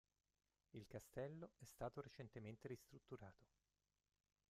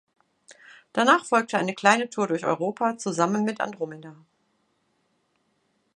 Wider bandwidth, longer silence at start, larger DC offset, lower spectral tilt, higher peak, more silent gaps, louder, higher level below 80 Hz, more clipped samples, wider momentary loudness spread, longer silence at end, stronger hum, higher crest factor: first, 15 kHz vs 11.5 kHz; first, 0.75 s vs 0.5 s; neither; first, -6.5 dB/octave vs -4.5 dB/octave; second, -38 dBFS vs -2 dBFS; neither; second, -57 LUFS vs -24 LUFS; about the same, -80 dBFS vs -78 dBFS; neither; second, 8 LU vs 11 LU; second, 1.05 s vs 1.85 s; neither; about the same, 22 dB vs 24 dB